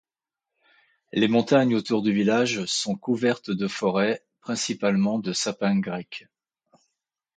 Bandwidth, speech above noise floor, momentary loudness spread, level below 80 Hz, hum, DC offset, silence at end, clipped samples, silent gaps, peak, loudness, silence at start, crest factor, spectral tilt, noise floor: 9.4 kHz; 65 dB; 11 LU; -68 dBFS; none; under 0.1%; 1.15 s; under 0.1%; none; -8 dBFS; -24 LUFS; 1.15 s; 18 dB; -4.5 dB/octave; -89 dBFS